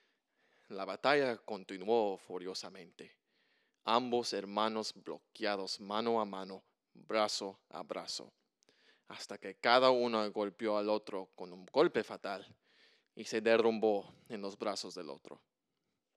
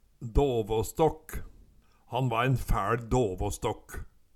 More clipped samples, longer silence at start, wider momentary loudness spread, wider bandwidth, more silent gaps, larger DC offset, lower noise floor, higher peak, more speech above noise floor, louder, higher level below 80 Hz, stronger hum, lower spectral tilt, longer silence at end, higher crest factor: neither; first, 0.7 s vs 0.2 s; first, 19 LU vs 15 LU; second, 12.5 kHz vs 16.5 kHz; neither; neither; first, -86 dBFS vs -58 dBFS; second, -12 dBFS vs -8 dBFS; first, 51 dB vs 30 dB; second, -35 LUFS vs -29 LUFS; second, under -90 dBFS vs -38 dBFS; neither; second, -3.5 dB/octave vs -6 dB/octave; first, 0.85 s vs 0.3 s; first, 26 dB vs 20 dB